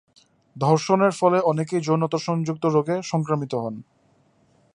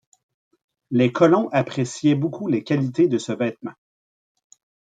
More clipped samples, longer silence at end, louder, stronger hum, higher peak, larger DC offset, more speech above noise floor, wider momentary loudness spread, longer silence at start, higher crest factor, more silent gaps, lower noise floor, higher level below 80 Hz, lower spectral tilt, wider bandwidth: neither; second, 0.95 s vs 1.2 s; about the same, -22 LUFS vs -21 LUFS; neither; about the same, -4 dBFS vs -4 dBFS; neither; second, 40 dB vs over 70 dB; about the same, 9 LU vs 9 LU; second, 0.55 s vs 0.9 s; about the same, 20 dB vs 18 dB; neither; second, -61 dBFS vs under -90 dBFS; about the same, -68 dBFS vs -68 dBFS; about the same, -6.5 dB/octave vs -6.5 dB/octave; first, 11 kHz vs 9.2 kHz